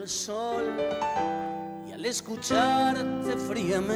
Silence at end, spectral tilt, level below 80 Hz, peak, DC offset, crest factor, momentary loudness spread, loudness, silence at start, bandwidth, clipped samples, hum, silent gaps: 0 s; -3.5 dB/octave; -58 dBFS; -12 dBFS; under 0.1%; 16 dB; 10 LU; -28 LUFS; 0 s; over 20 kHz; under 0.1%; none; none